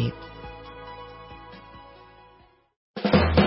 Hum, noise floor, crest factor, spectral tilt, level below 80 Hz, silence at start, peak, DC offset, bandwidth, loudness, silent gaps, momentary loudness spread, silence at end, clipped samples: none; -57 dBFS; 22 dB; -11 dB/octave; -38 dBFS; 0 s; -6 dBFS; under 0.1%; 5.8 kHz; -24 LUFS; 2.76-2.94 s; 25 LU; 0 s; under 0.1%